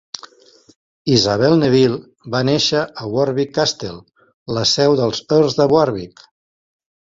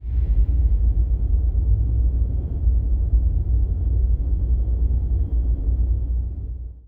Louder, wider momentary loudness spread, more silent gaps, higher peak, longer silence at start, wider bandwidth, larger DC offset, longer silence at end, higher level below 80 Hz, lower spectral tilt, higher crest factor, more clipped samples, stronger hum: first, -16 LUFS vs -23 LUFS; first, 15 LU vs 4 LU; first, 4.34-4.46 s vs none; first, -2 dBFS vs -8 dBFS; first, 1.05 s vs 0 s; first, 7.8 kHz vs 1 kHz; neither; first, 0.95 s vs 0.1 s; second, -52 dBFS vs -20 dBFS; second, -5 dB/octave vs -13 dB/octave; first, 16 dB vs 10 dB; neither; neither